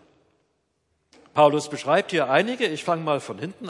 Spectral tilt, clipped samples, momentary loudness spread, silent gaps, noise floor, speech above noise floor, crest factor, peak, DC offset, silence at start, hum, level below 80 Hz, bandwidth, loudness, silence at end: -5 dB/octave; under 0.1%; 8 LU; none; -72 dBFS; 50 dB; 20 dB; -4 dBFS; under 0.1%; 1.35 s; none; -76 dBFS; 11.5 kHz; -22 LUFS; 0 s